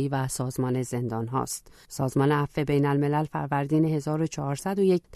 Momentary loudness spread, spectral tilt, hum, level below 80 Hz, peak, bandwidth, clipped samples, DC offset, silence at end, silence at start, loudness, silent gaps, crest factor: 6 LU; -6.5 dB/octave; none; -54 dBFS; -10 dBFS; 13.5 kHz; under 0.1%; under 0.1%; 0 s; 0 s; -27 LUFS; none; 16 dB